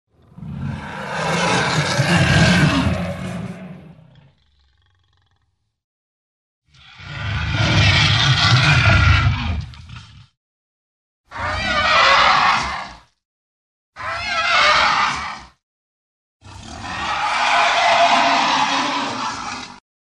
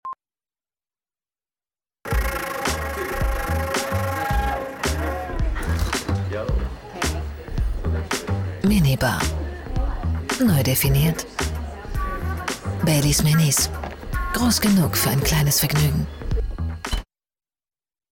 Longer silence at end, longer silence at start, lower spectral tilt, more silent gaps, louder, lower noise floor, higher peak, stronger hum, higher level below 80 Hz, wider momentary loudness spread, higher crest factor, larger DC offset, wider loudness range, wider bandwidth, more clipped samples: second, 0.4 s vs 1.1 s; first, 0.4 s vs 0.05 s; about the same, -4 dB/octave vs -4.5 dB/octave; first, 5.84-6.62 s, 10.37-11.24 s, 13.25-13.93 s, 15.63-16.40 s vs none; first, -16 LUFS vs -22 LUFS; second, -68 dBFS vs under -90 dBFS; first, -2 dBFS vs -8 dBFS; neither; about the same, -34 dBFS vs -30 dBFS; first, 19 LU vs 11 LU; about the same, 18 dB vs 14 dB; neither; about the same, 6 LU vs 6 LU; second, 12 kHz vs 17.5 kHz; neither